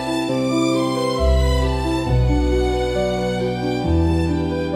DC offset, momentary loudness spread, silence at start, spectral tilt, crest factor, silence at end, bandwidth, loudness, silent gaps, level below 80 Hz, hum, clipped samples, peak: under 0.1%; 3 LU; 0 s; -6.5 dB/octave; 12 dB; 0 s; 13.5 kHz; -20 LUFS; none; -24 dBFS; none; under 0.1%; -6 dBFS